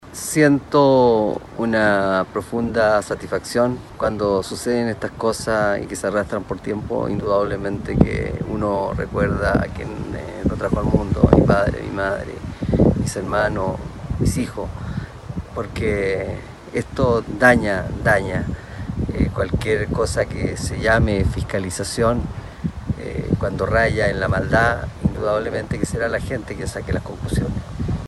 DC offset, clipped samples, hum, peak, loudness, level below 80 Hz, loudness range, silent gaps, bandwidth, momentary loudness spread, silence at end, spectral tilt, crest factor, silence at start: under 0.1%; under 0.1%; none; 0 dBFS; -21 LUFS; -32 dBFS; 3 LU; none; 13 kHz; 12 LU; 0 s; -6 dB/octave; 20 dB; 0 s